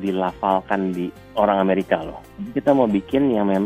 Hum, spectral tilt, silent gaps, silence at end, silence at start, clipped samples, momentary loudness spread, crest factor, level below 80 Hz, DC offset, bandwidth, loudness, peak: none; -8 dB/octave; none; 0 s; 0 s; under 0.1%; 10 LU; 18 dB; -50 dBFS; under 0.1%; 14.5 kHz; -21 LUFS; -2 dBFS